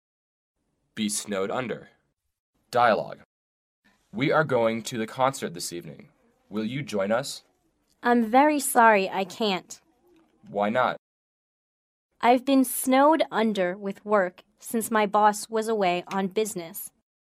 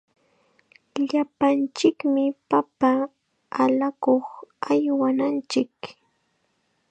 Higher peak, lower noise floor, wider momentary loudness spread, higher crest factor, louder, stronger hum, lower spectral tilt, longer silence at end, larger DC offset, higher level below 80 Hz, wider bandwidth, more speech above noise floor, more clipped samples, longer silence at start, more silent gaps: about the same, -4 dBFS vs -6 dBFS; about the same, -70 dBFS vs -70 dBFS; first, 17 LU vs 12 LU; about the same, 22 dB vs 18 dB; about the same, -24 LUFS vs -23 LUFS; neither; about the same, -4 dB/octave vs -5 dB/octave; second, 0.35 s vs 1 s; neither; about the same, -72 dBFS vs -74 dBFS; first, 16 kHz vs 8.8 kHz; about the same, 45 dB vs 48 dB; neither; about the same, 0.95 s vs 0.95 s; first, 2.39-2.53 s, 3.25-3.83 s, 10.99-12.09 s vs none